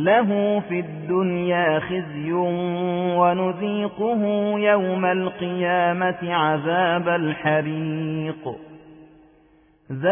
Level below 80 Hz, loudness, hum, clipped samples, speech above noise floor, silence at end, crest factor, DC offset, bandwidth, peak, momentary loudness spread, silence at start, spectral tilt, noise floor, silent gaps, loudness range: -62 dBFS; -22 LUFS; none; under 0.1%; 35 dB; 0 s; 16 dB; under 0.1%; 3.6 kHz; -6 dBFS; 8 LU; 0 s; -10.5 dB/octave; -56 dBFS; none; 3 LU